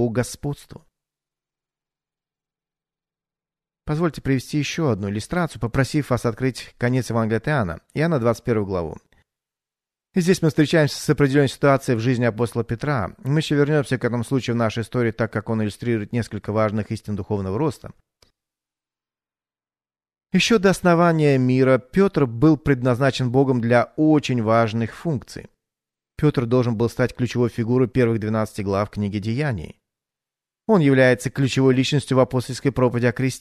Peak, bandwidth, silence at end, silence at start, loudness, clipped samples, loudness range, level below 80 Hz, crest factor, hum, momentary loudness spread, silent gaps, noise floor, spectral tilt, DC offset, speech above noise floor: -4 dBFS; 13.5 kHz; 0 s; 0 s; -21 LUFS; under 0.1%; 8 LU; -48 dBFS; 18 dB; none; 9 LU; none; under -90 dBFS; -6.5 dB/octave; under 0.1%; over 70 dB